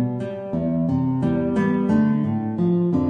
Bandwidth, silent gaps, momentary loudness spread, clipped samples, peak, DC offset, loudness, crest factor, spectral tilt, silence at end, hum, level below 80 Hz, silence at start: 6.6 kHz; none; 7 LU; under 0.1%; -8 dBFS; under 0.1%; -22 LUFS; 12 dB; -10 dB/octave; 0 s; none; -48 dBFS; 0 s